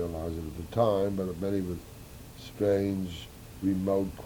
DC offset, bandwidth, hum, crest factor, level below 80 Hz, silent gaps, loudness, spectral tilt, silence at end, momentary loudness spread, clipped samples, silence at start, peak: under 0.1%; over 20 kHz; none; 16 dB; -50 dBFS; none; -31 LUFS; -7.5 dB/octave; 0 s; 19 LU; under 0.1%; 0 s; -14 dBFS